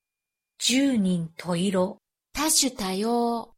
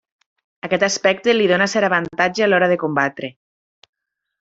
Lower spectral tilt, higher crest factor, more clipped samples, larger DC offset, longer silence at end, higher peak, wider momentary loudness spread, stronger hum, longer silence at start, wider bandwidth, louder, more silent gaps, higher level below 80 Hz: about the same, -3.5 dB/octave vs -4 dB/octave; about the same, 18 dB vs 18 dB; neither; neither; second, 0.15 s vs 1.1 s; second, -8 dBFS vs -2 dBFS; about the same, 9 LU vs 9 LU; neither; about the same, 0.6 s vs 0.65 s; first, 16 kHz vs 8 kHz; second, -24 LUFS vs -17 LUFS; neither; first, -56 dBFS vs -62 dBFS